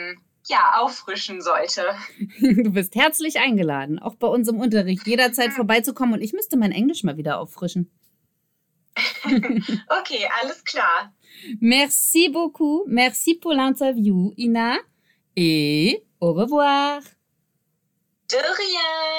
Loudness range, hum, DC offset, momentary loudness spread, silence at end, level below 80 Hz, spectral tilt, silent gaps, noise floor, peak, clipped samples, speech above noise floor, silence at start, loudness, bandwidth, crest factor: 5 LU; none; under 0.1%; 10 LU; 0 s; -64 dBFS; -4 dB/octave; none; -72 dBFS; -4 dBFS; under 0.1%; 52 dB; 0 s; -20 LUFS; 19 kHz; 16 dB